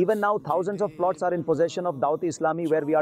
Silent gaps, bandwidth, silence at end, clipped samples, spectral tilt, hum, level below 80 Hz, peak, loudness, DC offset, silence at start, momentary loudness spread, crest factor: none; 14.5 kHz; 0 s; under 0.1%; -6.5 dB/octave; none; -68 dBFS; -12 dBFS; -25 LUFS; under 0.1%; 0 s; 3 LU; 12 dB